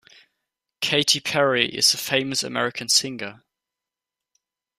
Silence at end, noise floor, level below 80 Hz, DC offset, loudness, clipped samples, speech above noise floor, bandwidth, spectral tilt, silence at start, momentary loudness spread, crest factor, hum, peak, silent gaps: 1.45 s; -88 dBFS; -66 dBFS; under 0.1%; -20 LUFS; under 0.1%; 65 dB; 15.5 kHz; -1.5 dB/octave; 0.8 s; 11 LU; 22 dB; none; -2 dBFS; none